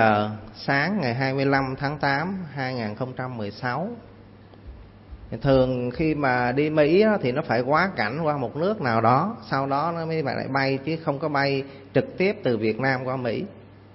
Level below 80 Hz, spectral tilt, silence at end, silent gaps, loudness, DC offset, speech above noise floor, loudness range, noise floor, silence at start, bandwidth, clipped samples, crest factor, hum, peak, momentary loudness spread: -50 dBFS; -10 dB/octave; 0.2 s; none; -24 LUFS; under 0.1%; 24 dB; 6 LU; -47 dBFS; 0 s; 5.8 kHz; under 0.1%; 18 dB; none; -6 dBFS; 10 LU